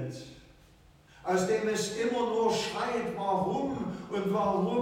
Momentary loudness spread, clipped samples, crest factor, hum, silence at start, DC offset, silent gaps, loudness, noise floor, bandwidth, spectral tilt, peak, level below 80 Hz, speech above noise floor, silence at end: 9 LU; under 0.1%; 14 dB; none; 0 s; under 0.1%; none; -30 LUFS; -58 dBFS; 16.5 kHz; -5 dB/octave; -16 dBFS; -62 dBFS; 29 dB; 0 s